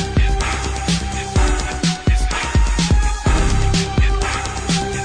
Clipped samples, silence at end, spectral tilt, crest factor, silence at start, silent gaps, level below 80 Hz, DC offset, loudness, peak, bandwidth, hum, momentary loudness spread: under 0.1%; 0 s; -4.5 dB/octave; 14 dB; 0 s; none; -20 dBFS; under 0.1%; -19 LUFS; -4 dBFS; 10.5 kHz; none; 4 LU